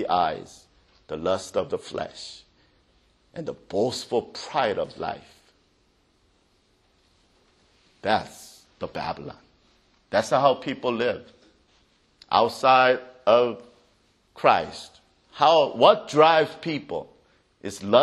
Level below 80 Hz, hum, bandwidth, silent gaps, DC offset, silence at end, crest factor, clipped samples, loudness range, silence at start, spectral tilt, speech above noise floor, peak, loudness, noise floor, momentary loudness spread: -62 dBFS; none; 12.5 kHz; none; under 0.1%; 0 s; 24 dB; under 0.1%; 12 LU; 0 s; -4.5 dB/octave; 42 dB; -2 dBFS; -23 LUFS; -65 dBFS; 20 LU